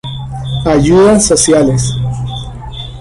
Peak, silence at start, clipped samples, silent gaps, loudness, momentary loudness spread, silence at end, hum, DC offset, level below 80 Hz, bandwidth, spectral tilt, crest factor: 0 dBFS; 0.05 s; under 0.1%; none; -10 LUFS; 17 LU; 0 s; none; under 0.1%; -28 dBFS; 11.5 kHz; -5 dB/octave; 12 dB